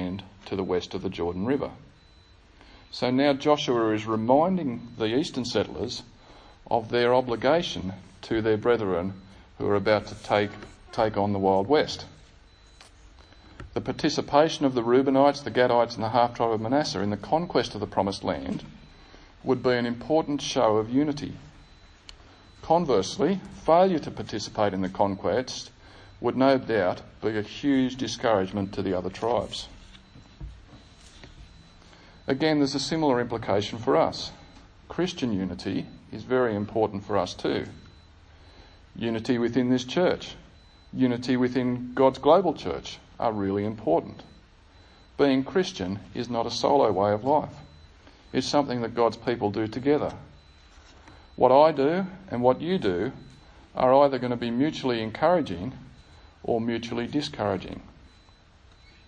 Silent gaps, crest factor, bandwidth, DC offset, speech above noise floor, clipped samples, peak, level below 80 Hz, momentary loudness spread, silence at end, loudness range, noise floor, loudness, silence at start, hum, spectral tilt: none; 22 dB; 10 kHz; under 0.1%; 30 dB; under 0.1%; -4 dBFS; -54 dBFS; 14 LU; 1.25 s; 5 LU; -55 dBFS; -26 LUFS; 0 s; none; -6 dB/octave